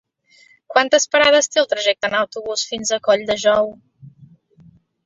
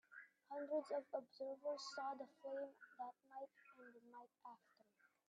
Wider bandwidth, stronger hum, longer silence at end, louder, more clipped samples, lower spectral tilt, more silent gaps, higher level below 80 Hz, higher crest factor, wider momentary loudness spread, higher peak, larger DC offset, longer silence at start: second, 7.8 kHz vs 9.6 kHz; neither; first, 0.8 s vs 0.25 s; first, -17 LUFS vs -50 LUFS; neither; second, -1 dB/octave vs -2.5 dB/octave; neither; first, -58 dBFS vs under -90 dBFS; about the same, 18 dB vs 20 dB; second, 9 LU vs 17 LU; first, -2 dBFS vs -32 dBFS; neither; first, 0.7 s vs 0.1 s